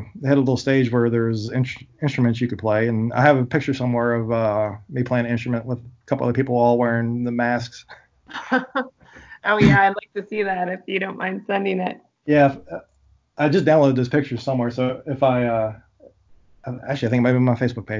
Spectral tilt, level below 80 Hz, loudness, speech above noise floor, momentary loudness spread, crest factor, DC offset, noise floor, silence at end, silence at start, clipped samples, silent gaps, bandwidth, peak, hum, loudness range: -7.5 dB/octave; -50 dBFS; -21 LUFS; 33 dB; 12 LU; 20 dB; under 0.1%; -53 dBFS; 0 s; 0 s; under 0.1%; none; 7.6 kHz; 0 dBFS; none; 2 LU